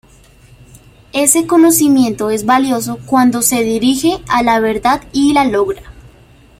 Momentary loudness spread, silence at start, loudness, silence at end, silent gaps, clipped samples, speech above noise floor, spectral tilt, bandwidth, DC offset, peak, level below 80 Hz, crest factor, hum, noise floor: 7 LU; 1.15 s; -12 LUFS; 0.5 s; none; under 0.1%; 32 dB; -3.5 dB/octave; 16.5 kHz; under 0.1%; 0 dBFS; -42 dBFS; 14 dB; none; -44 dBFS